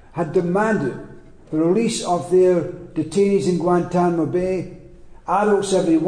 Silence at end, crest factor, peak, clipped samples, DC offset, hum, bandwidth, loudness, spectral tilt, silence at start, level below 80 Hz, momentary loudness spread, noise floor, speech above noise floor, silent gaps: 0 s; 12 dB; -6 dBFS; under 0.1%; under 0.1%; none; 10 kHz; -19 LUFS; -6 dB/octave; 0.15 s; -48 dBFS; 10 LU; -41 dBFS; 23 dB; none